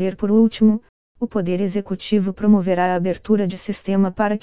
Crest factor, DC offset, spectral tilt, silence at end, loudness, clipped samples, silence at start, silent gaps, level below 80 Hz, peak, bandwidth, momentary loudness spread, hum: 14 dB; 1%; -12 dB/octave; 0 s; -19 LUFS; under 0.1%; 0 s; 0.89-1.15 s; -52 dBFS; -4 dBFS; 4 kHz; 9 LU; none